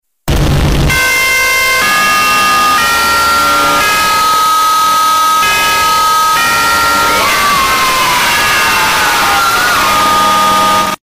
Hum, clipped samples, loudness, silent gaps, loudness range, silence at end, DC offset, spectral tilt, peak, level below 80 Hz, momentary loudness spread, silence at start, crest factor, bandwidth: none; under 0.1%; -8 LUFS; none; 0 LU; 0.05 s; under 0.1%; -2 dB/octave; -4 dBFS; -26 dBFS; 1 LU; 0.25 s; 6 dB; 16 kHz